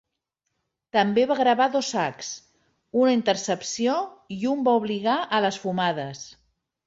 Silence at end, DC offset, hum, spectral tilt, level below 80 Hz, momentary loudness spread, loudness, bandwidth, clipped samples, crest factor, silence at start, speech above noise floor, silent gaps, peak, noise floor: 0.6 s; under 0.1%; none; -4 dB/octave; -68 dBFS; 14 LU; -24 LUFS; 8 kHz; under 0.1%; 20 dB; 0.95 s; 57 dB; none; -6 dBFS; -81 dBFS